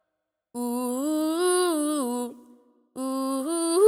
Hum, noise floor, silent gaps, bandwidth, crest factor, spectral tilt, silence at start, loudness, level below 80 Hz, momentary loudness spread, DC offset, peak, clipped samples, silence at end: none; -82 dBFS; none; 16 kHz; 18 dB; -2 dB/octave; 0.55 s; -27 LUFS; -76 dBFS; 12 LU; under 0.1%; -8 dBFS; under 0.1%; 0 s